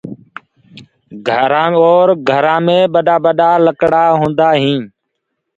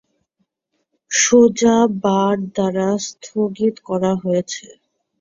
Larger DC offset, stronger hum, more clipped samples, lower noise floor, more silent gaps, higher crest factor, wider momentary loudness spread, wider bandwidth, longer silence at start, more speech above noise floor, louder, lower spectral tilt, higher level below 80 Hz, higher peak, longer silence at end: neither; neither; neither; about the same, -72 dBFS vs -73 dBFS; neither; about the same, 12 dB vs 16 dB; second, 8 LU vs 11 LU; about the same, 7.8 kHz vs 7.6 kHz; second, 0.05 s vs 1.1 s; first, 61 dB vs 56 dB; first, -11 LUFS vs -17 LUFS; first, -7 dB/octave vs -4.5 dB/octave; about the same, -54 dBFS vs -56 dBFS; about the same, 0 dBFS vs -2 dBFS; first, 0.7 s vs 0.55 s